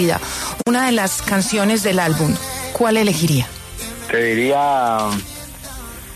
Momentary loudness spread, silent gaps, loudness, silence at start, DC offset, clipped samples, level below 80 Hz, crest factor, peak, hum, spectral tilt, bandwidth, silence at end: 14 LU; none; -18 LUFS; 0 s; under 0.1%; under 0.1%; -42 dBFS; 14 dB; -6 dBFS; none; -4.5 dB/octave; 14 kHz; 0 s